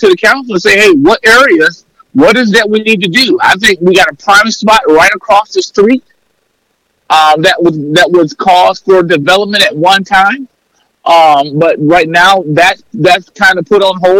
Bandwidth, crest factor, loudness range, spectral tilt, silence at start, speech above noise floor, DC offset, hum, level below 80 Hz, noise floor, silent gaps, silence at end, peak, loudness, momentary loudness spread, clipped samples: 17 kHz; 8 dB; 2 LU; -4 dB/octave; 0 s; 53 dB; under 0.1%; none; -42 dBFS; -59 dBFS; none; 0 s; 0 dBFS; -7 LUFS; 5 LU; 0.3%